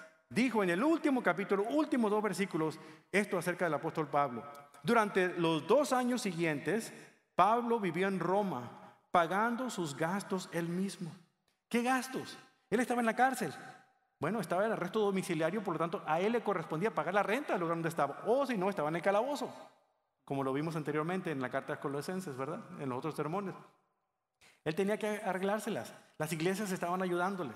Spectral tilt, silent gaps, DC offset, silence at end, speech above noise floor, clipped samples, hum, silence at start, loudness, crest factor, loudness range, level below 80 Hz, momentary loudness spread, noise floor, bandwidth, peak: -5.5 dB/octave; none; under 0.1%; 0 s; 51 dB; under 0.1%; none; 0 s; -34 LUFS; 22 dB; 6 LU; -78 dBFS; 11 LU; -84 dBFS; 16 kHz; -12 dBFS